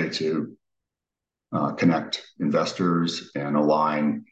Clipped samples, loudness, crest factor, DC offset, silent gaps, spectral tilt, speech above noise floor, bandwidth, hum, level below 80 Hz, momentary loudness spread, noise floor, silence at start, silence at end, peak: under 0.1%; -24 LUFS; 16 dB; under 0.1%; none; -6 dB/octave; 64 dB; 8.4 kHz; none; -70 dBFS; 9 LU; -88 dBFS; 0 s; 0.1 s; -8 dBFS